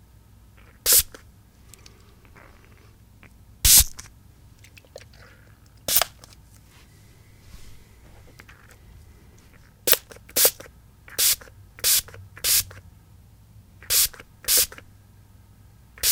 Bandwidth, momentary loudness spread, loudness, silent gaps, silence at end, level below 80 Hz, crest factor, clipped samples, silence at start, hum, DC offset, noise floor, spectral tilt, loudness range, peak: 18 kHz; 18 LU; -20 LUFS; none; 0 s; -42 dBFS; 28 dB; under 0.1%; 0.85 s; none; under 0.1%; -52 dBFS; 0 dB/octave; 8 LU; 0 dBFS